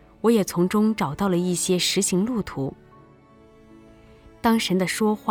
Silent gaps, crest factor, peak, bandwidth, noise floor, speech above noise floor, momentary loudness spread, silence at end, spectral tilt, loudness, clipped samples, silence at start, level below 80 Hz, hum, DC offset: none; 16 dB; -8 dBFS; 19 kHz; -51 dBFS; 30 dB; 6 LU; 0 s; -4.5 dB/octave; -22 LUFS; under 0.1%; 0.25 s; -54 dBFS; none; under 0.1%